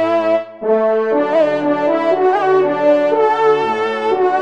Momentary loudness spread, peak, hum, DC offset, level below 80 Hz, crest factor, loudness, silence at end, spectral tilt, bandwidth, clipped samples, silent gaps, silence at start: 4 LU; -2 dBFS; none; 0.4%; -68 dBFS; 12 dB; -15 LUFS; 0 s; -6 dB/octave; 8.4 kHz; under 0.1%; none; 0 s